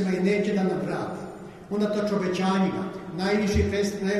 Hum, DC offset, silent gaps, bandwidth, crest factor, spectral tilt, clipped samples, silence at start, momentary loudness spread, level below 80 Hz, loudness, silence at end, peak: none; under 0.1%; none; 12.5 kHz; 14 dB; -6.5 dB/octave; under 0.1%; 0 s; 10 LU; -42 dBFS; -26 LUFS; 0 s; -10 dBFS